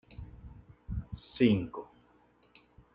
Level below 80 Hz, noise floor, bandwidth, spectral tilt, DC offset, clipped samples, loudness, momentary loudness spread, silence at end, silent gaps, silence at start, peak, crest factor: -50 dBFS; -66 dBFS; 5.2 kHz; -10 dB/octave; under 0.1%; under 0.1%; -31 LUFS; 26 LU; 1.1 s; none; 0.2 s; -14 dBFS; 22 dB